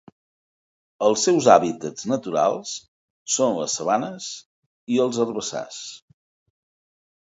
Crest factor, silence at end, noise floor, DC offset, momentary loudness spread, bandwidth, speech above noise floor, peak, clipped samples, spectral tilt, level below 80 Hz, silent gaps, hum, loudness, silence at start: 24 dB; 1.35 s; under -90 dBFS; under 0.1%; 18 LU; 8 kHz; over 68 dB; 0 dBFS; under 0.1%; -3.5 dB/octave; -68 dBFS; 2.88-3.26 s, 4.46-4.87 s; none; -22 LUFS; 1 s